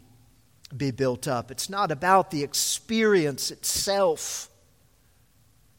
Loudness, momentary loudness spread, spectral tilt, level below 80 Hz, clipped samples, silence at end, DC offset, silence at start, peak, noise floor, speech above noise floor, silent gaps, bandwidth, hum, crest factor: -25 LUFS; 10 LU; -3.5 dB/octave; -58 dBFS; under 0.1%; 1.35 s; under 0.1%; 0.7 s; -6 dBFS; -62 dBFS; 37 dB; none; 17 kHz; none; 22 dB